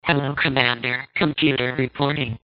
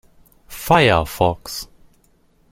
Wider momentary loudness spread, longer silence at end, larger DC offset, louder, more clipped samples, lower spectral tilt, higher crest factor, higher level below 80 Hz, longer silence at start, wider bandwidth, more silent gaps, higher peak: second, 5 LU vs 22 LU; second, 0.1 s vs 0.85 s; neither; second, -21 LUFS vs -17 LUFS; neither; second, -3 dB/octave vs -5 dB/octave; about the same, 22 dB vs 20 dB; second, -50 dBFS vs -40 dBFS; second, 0.05 s vs 0.5 s; second, 5.2 kHz vs 16.5 kHz; neither; about the same, 0 dBFS vs 0 dBFS